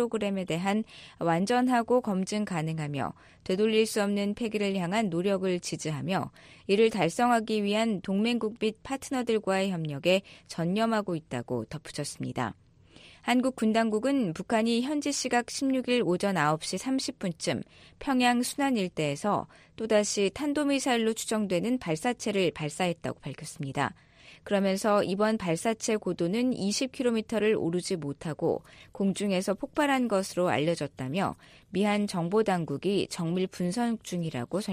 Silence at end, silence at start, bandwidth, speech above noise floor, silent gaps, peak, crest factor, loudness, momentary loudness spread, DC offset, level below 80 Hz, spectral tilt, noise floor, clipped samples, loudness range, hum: 0 s; 0 s; 15 kHz; 27 dB; none; -10 dBFS; 18 dB; -29 LUFS; 9 LU; under 0.1%; -64 dBFS; -5 dB/octave; -55 dBFS; under 0.1%; 2 LU; none